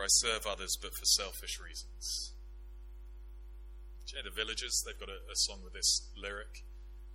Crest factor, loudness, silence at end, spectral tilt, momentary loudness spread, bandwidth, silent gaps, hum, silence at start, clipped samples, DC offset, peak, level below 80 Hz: 22 dB; -34 LUFS; 0 s; 0 dB/octave; 24 LU; 16.5 kHz; none; 50 Hz at -50 dBFS; 0 s; under 0.1%; under 0.1%; -14 dBFS; -48 dBFS